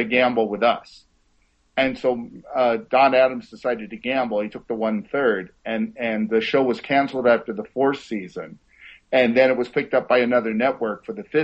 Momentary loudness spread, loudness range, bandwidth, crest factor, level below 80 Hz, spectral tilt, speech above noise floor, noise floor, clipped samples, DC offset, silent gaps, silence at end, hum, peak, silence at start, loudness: 11 LU; 2 LU; 8 kHz; 18 dB; -60 dBFS; -6.5 dB/octave; 42 dB; -63 dBFS; under 0.1%; under 0.1%; none; 0 s; none; -2 dBFS; 0 s; -21 LUFS